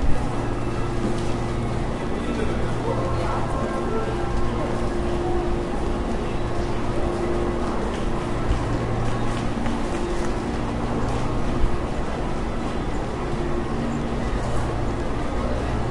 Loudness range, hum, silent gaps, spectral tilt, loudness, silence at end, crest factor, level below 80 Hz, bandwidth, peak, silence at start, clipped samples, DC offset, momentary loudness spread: 1 LU; none; none; -6.5 dB/octave; -26 LUFS; 0 s; 16 dB; -28 dBFS; 11.5 kHz; -6 dBFS; 0 s; under 0.1%; under 0.1%; 2 LU